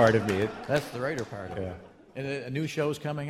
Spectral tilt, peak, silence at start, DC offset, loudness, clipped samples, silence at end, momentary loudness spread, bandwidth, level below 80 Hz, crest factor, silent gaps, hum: -6 dB/octave; -8 dBFS; 0 s; under 0.1%; -31 LUFS; under 0.1%; 0 s; 11 LU; 16 kHz; -58 dBFS; 22 dB; none; none